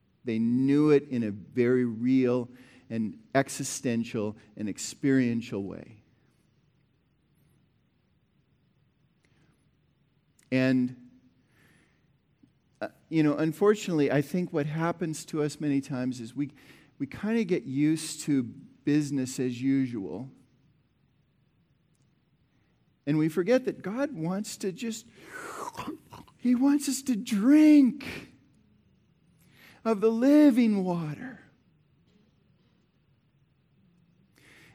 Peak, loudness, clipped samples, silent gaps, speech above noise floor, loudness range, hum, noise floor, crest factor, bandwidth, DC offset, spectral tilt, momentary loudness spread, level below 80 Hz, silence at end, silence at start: -10 dBFS; -27 LUFS; under 0.1%; none; 43 dB; 9 LU; none; -69 dBFS; 20 dB; 15.5 kHz; under 0.1%; -6 dB/octave; 17 LU; -72 dBFS; 3.4 s; 0.25 s